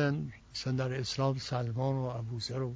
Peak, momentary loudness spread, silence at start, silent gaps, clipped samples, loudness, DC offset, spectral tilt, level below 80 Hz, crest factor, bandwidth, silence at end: -18 dBFS; 6 LU; 0 s; none; under 0.1%; -34 LUFS; under 0.1%; -6 dB/octave; -58 dBFS; 16 dB; 8 kHz; 0 s